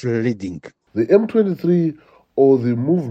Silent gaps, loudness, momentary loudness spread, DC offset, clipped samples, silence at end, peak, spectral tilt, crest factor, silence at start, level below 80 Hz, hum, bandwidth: none; -18 LUFS; 13 LU; under 0.1%; under 0.1%; 0 s; -2 dBFS; -9.5 dB/octave; 16 dB; 0 s; -60 dBFS; none; 7.6 kHz